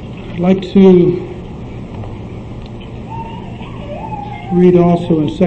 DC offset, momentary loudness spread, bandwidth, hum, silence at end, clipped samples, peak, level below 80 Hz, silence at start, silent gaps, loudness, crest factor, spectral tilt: under 0.1%; 20 LU; 6.4 kHz; none; 0 s; under 0.1%; 0 dBFS; -34 dBFS; 0 s; none; -12 LUFS; 14 dB; -9.5 dB/octave